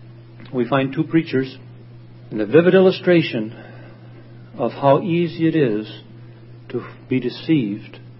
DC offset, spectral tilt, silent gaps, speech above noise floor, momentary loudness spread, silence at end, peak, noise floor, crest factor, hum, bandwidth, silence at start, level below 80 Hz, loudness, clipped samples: under 0.1%; -12 dB/octave; none; 22 dB; 19 LU; 0.05 s; 0 dBFS; -40 dBFS; 20 dB; none; 5.8 kHz; 0 s; -60 dBFS; -19 LUFS; under 0.1%